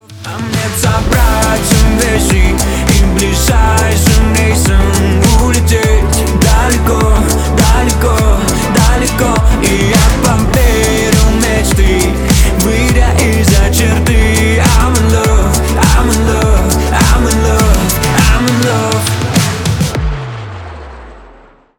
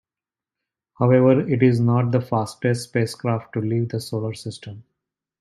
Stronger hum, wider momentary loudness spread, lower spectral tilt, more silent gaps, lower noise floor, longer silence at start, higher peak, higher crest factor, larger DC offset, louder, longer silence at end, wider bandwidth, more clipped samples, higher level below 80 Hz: neither; second, 4 LU vs 14 LU; second, -4.5 dB/octave vs -7.5 dB/octave; neither; second, -40 dBFS vs under -90 dBFS; second, 0.1 s vs 1 s; first, 0 dBFS vs -4 dBFS; second, 10 dB vs 18 dB; neither; first, -10 LUFS vs -21 LUFS; about the same, 0.55 s vs 0.6 s; first, 19.5 kHz vs 12.5 kHz; neither; first, -12 dBFS vs -62 dBFS